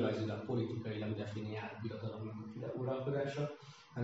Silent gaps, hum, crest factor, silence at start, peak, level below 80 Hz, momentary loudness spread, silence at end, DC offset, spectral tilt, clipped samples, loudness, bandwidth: none; none; 16 dB; 0 s; -24 dBFS; -76 dBFS; 8 LU; 0 s; under 0.1%; -6.5 dB/octave; under 0.1%; -41 LUFS; 7.6 kHz